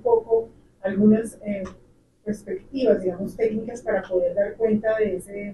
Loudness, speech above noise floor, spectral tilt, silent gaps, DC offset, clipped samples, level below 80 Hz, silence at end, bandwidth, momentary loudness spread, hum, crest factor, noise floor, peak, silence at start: -24 LUFS; 33 dB; -7.5 dB/octave; none; under 0.1%; under 0.1%; -52 dBFS; 0 s; 12 kHz; 12 LU; none; 18 dB; -56 dBFS; -6 dBFS; 0.05 s